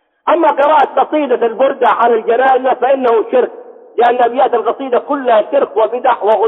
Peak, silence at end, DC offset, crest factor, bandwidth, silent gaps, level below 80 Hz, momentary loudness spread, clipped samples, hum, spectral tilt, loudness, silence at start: -2 dBFS; 0 s; under 0.1%; 10 dB; 4.1 kHz; none; -66 dBFS; 5 LU; under 0.1%; none; -6 dB/octave; -12 LUFS; 0.25 s